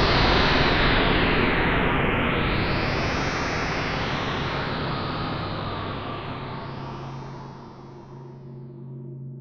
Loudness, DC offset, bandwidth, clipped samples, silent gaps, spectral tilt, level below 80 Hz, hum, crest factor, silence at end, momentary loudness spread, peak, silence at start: -24 LUFS; under 0.1%; 7.2 kHz; under 0.1%; none; -6 dB/octave; -34 dBFS; none; 18 dB; 0 s; 21 LU; -8 dBFS; 0 s